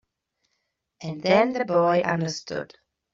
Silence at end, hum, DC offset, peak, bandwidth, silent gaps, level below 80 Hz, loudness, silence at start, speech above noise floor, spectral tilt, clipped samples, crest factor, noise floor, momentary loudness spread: 0.5 s; none; under 0.1%; -6 dBFS; 7.6 kHz; none; -66 dBFS; -23 LUFS; 1 s; 54 dB; -4.5 dB/octave; under 0.1%; 20 dB; -77 dBFS; 16 LU